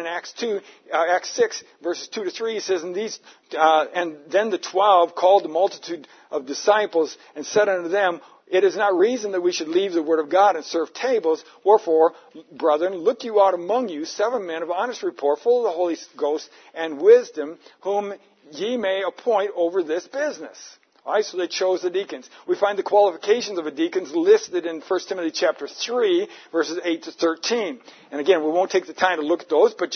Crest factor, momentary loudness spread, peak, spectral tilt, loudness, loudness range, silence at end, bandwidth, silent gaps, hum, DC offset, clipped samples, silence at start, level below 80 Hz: 20 dB; 12 LU; -2 dBFS; -3 dB/octave; -22 LUFS; 4 LU; 0 s; 6.6 kHz; none; none; under 0.1%; under 0.1%; 0 s; -82 dBFS